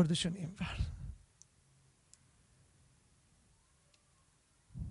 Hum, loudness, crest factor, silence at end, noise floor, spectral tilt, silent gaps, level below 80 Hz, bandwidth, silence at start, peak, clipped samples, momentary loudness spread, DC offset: none; -39 LUFS; 26 dB; 0 s; -71 dBFS; -5 dB/octave; none; -52 dBFS; 11.5 kHz; 0 s; -16 dBFS; under 0.1%; 29 LU; under 0.1%